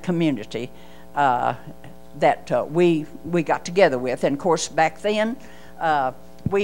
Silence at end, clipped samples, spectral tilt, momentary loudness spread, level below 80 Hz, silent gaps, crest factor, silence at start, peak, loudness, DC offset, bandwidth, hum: 0 s; under 0.1%; -5.5 dB/octave; 13 LU; -54 dBFS; none; 20 dB; 0.05 s; -4 dBFS; -22 LUFS; 1%; 16 kHz; none